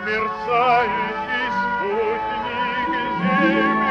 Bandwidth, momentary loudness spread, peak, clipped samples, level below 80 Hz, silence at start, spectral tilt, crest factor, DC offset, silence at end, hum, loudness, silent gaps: 7.8 kHz; 6 LU; -6 dBFS; under 0.1%; -50 dBFS; 0 s; -6.5 dB/octave; 14 dB; under 0.1%; 0 s; none; -20 LUFS; none